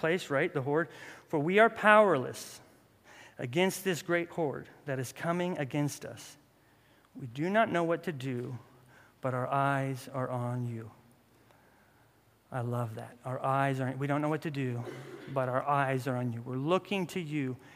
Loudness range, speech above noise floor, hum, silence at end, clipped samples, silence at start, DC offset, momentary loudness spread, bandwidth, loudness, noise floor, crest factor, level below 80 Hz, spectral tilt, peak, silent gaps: 8 LU; 34 dB; none; 0 s; under 0.1%; 0 s; under 0.1%; 15 LU; 15.5 kHz; -31 LUFS; -65 dBFS; 26 dB; -76 dBFS; -6 dB/octave; -6 dBFS; none